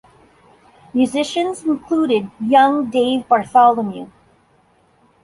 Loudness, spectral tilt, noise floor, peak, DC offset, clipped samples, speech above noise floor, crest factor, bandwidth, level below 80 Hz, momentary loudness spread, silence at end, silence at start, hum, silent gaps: -17 LUFS; -5 dB/octave; -56 dBFS; -2 dBFS; under 0.1%; under 0.1%; 40 dB; 16 dB; 11.5 kHz; -60 dBFS; 10 LU; 1.15 s; 0.95 s; none; none